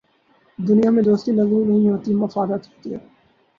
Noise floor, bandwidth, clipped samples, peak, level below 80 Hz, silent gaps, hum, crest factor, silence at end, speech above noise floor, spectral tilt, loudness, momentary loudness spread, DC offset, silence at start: -59 dBFS; 6.8 kHz; under 0.1%; -6 dBFS; -60 dBFS; none; none; 14 dB; 0.6 s; 41 dB; -9.5 dB/octave; -18 LUFS; 17 LU; under 0.1%; 0.6 s